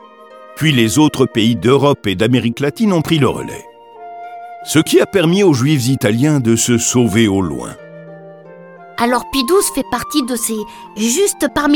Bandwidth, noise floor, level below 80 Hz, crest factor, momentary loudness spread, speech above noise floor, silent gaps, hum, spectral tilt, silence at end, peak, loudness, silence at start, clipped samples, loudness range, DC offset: 19 kHz; -38 dBFS; -46 dBFS; 14 dB; 18 LU; 25 dB; none; none; -4.5 dB/octave; 0 s; 0 dBFS; -14 LUFS; 0.3 s; under 0.1%; 4 LU; under 0.1%